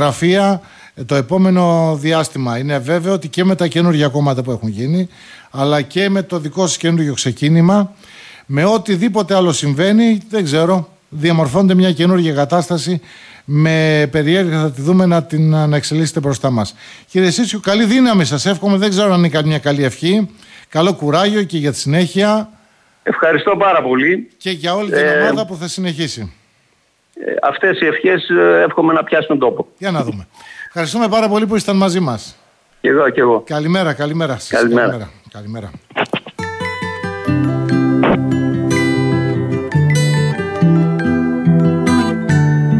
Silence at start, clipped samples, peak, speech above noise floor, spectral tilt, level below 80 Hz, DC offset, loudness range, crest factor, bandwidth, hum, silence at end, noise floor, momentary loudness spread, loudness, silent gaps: 0 s; under 0.1%; -2 dBFS; 44 dB; -6 dB/octave; -52 dBFS; under 0.1%; 3 LU; 12 dB; 11 kHz; none; 0 s; -58 dBFS; 10 LU; -14 LUFS; none